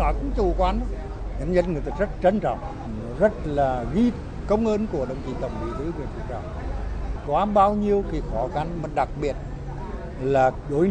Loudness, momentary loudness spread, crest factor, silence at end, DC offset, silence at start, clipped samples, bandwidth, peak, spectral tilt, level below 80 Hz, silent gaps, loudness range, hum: -25 LUFS; 12 LU; 18 dB; 0 s; under 0.1%; 0 s; under 0.1%; 9.2 kHz; -6 dBFS; -8 dB/octave; -32 dBFS; none; 3 LU; none